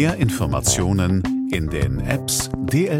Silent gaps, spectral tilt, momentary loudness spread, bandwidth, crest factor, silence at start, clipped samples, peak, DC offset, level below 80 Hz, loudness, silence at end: none; -5 dB/octave; 4 LU; 16.5 kHz; 16 dB; 0 s; under 0.1%; -4 dBFS; under 0.1%; -34 dBFS; -20 LUFS; 0 s